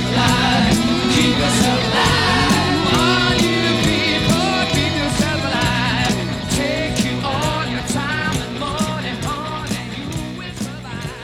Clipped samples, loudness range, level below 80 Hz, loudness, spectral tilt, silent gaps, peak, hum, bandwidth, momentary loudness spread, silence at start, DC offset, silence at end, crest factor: under 0.1%; 7 LU; -34 dBFS; -17 LUFS; -4 dB/octave; none; 0 dBFS; none; 17.5 kHz; 11 LU; 0 s; under 0.1%; 0 s; 18 dB